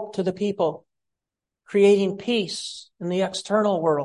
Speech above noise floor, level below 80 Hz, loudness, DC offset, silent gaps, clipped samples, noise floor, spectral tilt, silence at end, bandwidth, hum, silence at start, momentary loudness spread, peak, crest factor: 65 dB; -68 dBFS; -23 LUFS; under 0.1%; none; under 0.1%; -87 dBFS; -5.5 dB/octave; 0 s; 11.5 kHz; none; 0 s; 13 LU; -6 dBFS; 16 dB